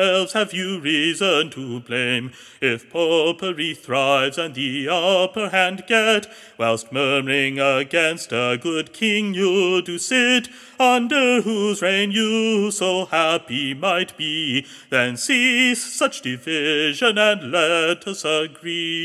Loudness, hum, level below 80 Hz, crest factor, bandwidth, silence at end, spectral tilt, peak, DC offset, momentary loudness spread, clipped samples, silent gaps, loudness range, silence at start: -19 LUFS; none; -74 dBFS; 18 dB; 14.5 kHz; 0 s; -3 dB/octave; -2 dBFS; under 0.1%; 7 LU; under 0.1%; none; 3 LU; 0 s